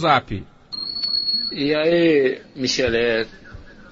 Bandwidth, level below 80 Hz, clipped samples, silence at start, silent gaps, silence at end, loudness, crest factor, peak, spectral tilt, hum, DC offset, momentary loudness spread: 7.8 kHz; -46 dBFS; under 0.1%; 0 s; none; 0.05 s; -20 LUFS; 18 dB; -4 dBFS; -4 dB/octave; none; under 0.1%; 14 LU